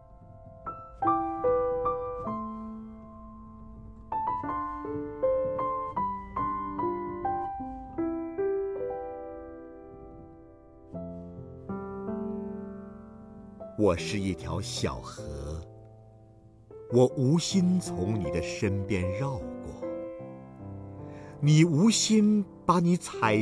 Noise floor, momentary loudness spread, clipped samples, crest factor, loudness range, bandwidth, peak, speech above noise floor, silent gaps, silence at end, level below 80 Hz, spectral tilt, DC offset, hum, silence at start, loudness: -54 dBFS; 22 LU; under 0.1%; 20 dB; 13 LU; 11 kHz; -10 dBFS; 29 dB; none; 0 s; -52 dBFS; -6 dB/octave; under 0.1%; none; 0 s; -29 LUFS